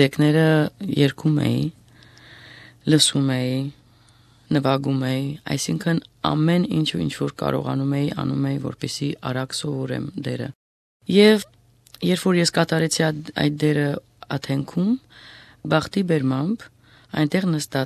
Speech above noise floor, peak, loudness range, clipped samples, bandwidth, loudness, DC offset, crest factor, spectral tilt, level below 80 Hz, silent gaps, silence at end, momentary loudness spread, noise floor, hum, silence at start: 33 dB; -2 dBFS; 4 LU; under 0.1%; 14 kHz; -22 LUFS; under 0.1%; 20 dB; -5.5 dB/octave; -54 dBFS; 10.55-11.00 s; 0 s; 12 LU; -54 dBFS; none; 0 s